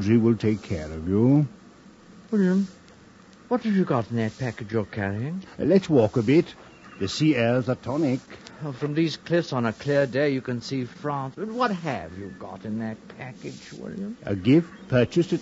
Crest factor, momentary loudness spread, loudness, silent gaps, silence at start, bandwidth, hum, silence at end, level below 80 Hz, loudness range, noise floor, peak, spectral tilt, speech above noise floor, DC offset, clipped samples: 18 dB; 16 LU; -25 LUFS; none; 0 s; 8 kHz; none; 0 s; -54 dBFS; 6 LU; -50 dBFS; -6 dBFS; -7.5 dB/octave; 26 dB; under 0.1%; under 0.1%